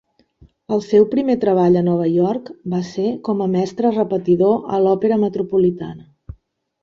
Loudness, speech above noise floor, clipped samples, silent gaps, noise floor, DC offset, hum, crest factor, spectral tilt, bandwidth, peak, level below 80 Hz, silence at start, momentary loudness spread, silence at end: -18 LUFS; 36 dB; under 0.1%; none; -53 dBFS; under 0.1%; none; 16 dB; -8.5 dB/octave; 7.2 kHz; -2 dBFS; -52 dBFS; 0.7 s; 9 LU; 0.5 s